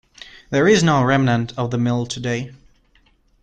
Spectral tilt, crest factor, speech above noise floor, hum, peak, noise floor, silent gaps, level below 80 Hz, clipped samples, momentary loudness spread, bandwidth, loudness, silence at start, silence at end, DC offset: -5.5 dB/octave; 16 dB; 40 dB; none; -4 dBFS; -58 dBFS; none; -50 dBFS; under 0.1%; 10 LU; 9.2 kHz; -18 LUFS; 0.35 s; 0.9 s; under 0.1%